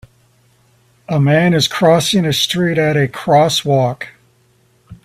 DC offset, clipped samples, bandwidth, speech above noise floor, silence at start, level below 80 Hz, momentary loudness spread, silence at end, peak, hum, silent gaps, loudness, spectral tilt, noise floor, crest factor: under 0.1%; under 0.1%; 15.5 kHz; 42 dB; 1.1 s; -52 dBFS; 7 LU; 0.1 s; 0 dBFS; none; none; -14 LUFS; -5 dB/octave; -55 dBFS; 16 dB